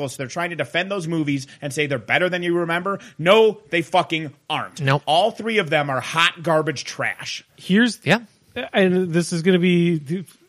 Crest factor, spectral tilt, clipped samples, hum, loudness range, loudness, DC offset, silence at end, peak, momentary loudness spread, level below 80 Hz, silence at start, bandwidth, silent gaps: 18 dB; -5 dB/octave; under 0.1%; none; 1 LU; -20 LUFS; under 0.1%; 0.25 s; -2 dBFS; 10 LU; -66 dBFS; 0 s; 14.5 kHz; none